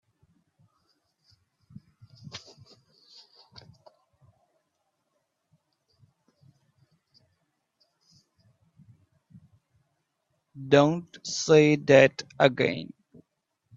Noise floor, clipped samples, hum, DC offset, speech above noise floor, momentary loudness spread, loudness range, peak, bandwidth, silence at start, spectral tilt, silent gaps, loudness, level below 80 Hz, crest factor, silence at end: -78 dBFS; under 0.1%; none; under 0.1%; 56 dB; 25 LU; 7 LU; -2 dBFS; 7.8 kHz; 2.35 s; -5 dB/octave; none; -22 LUFS; -70 dBFS; 28 dB; 0.9 s